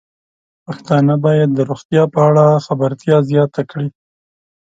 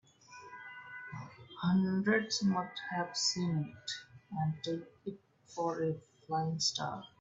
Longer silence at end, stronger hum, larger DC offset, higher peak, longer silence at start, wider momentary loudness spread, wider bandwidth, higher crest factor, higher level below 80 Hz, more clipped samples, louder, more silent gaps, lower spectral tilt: first, 0.8 s vs 0.15 s; neither; neither; first, 0 dBFS vs -18 dBFS; first, 0.7 s vs 0.3 s; second, 13 LU vs 18 LU; about the same, 7.8 kHz vs 8 kHz; about the same, 14 dB vs 18 dB; first, -58 dBFS vs -72 dBFS; neither; first, -14 LUFS vs -35 LUFS; first, 1.85-1.89 s vs none; first, -8.5 dB/octave vs -4.5 dB/octave